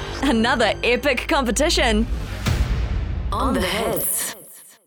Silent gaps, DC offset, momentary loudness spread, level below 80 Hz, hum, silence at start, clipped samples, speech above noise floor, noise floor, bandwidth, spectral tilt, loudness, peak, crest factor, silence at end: none; under 0.1%; 8 LU; -28 dBFS; none; 0 s; under 0.1%; 24 dB; -44 dBFS; over 20 kHz; -4 dB/octave; -21 LUFS; -8 dBFS; 14 dB; 0.2 s